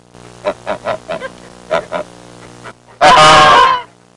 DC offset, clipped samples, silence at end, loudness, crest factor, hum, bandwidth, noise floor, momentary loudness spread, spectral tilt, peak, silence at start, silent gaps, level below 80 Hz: under 0.1%; under 0.1%; 0.35 s; -9 LUFS; 12 dB; 60 Hz at -45 dBFS; 11.5 kHz; -36 dBFS; 21 LU; -2.5 dB/octave; 0 dBFS; 0.45 s; none; -42 dBFS